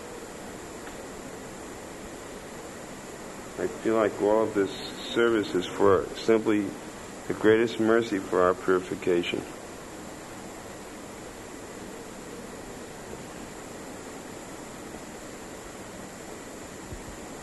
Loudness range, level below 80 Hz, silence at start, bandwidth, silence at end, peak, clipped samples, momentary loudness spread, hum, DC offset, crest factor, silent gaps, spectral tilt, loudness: 15 LU; -56 dBFS; 0 s; 12 kHz; 0 s; -8 dBFS; under 0.1%; 17 LU; none; under 0.1%; 22 dB; none; -5 dB/octave; -27 LUFS